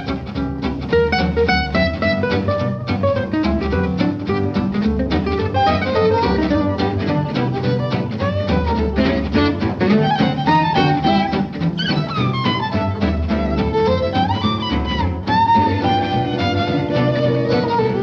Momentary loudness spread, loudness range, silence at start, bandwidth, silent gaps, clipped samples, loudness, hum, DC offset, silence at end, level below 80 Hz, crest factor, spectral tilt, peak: 5 LU; 2 LU; 0 s; 7 kHz; none; under 0.1%; -18 LUFS; none; under 0.1%; 0 s; -32 dBFS; 14 dB; -7.5 dB/octave; -2 dBFS